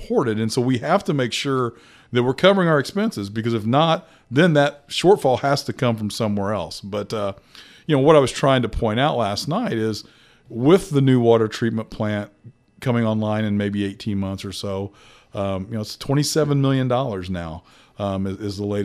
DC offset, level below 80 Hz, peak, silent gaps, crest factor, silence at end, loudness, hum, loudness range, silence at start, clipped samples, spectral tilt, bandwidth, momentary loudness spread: under 0.1%; -46 dBFS; 0 dBFS; none; 20 dB; 0 s; -21 LUFS; none; 5 LU; 0 s; under 0.1%; -6 dB/octave; 15 kHz; 12 LU